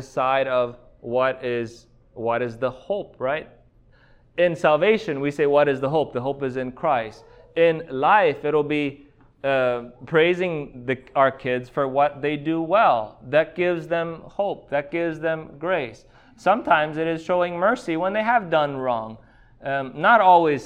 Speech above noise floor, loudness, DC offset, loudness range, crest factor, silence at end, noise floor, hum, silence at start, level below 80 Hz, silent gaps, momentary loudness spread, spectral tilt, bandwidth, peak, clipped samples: 33 dB; -22 LUFS; under 0.1%; 4 LU; 18 dB; 0 s; -55 dBFS; none; 0 s; -56 dBFS; none; 11 LU; -6.5 dB/octave; 9.8 kHz; -4 dBFS; under 0.1%